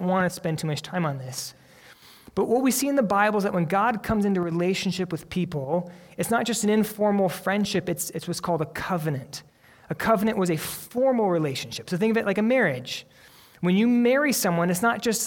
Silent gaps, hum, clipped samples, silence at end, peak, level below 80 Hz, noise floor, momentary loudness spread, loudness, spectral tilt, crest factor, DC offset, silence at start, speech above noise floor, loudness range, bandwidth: none; none; under 0.1%; 0 s; -8 dBFS; -56 dBFS; -51 dBFS; 10 LU; -25 LUFS; -5 dB/octave; 18 dB; under 0.1%; 0 s; 27 dB; 3 LU; 18.5 kHz